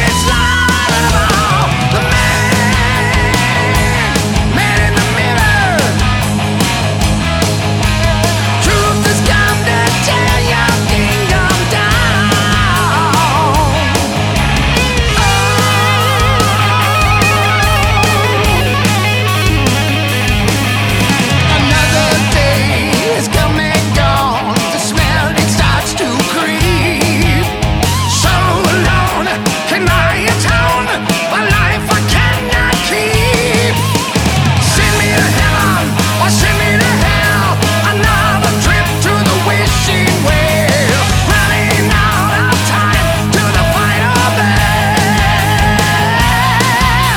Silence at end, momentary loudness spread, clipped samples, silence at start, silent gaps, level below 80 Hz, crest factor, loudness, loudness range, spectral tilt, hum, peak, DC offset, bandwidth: 0 s; 3 LU; under 0.1%; 0 s; none; -22 dBFS; 10 dB; -11 LUFS; 2 LU; -4 dB/octave; none; 0 dBFS; under 0.1%; 18.5 kHz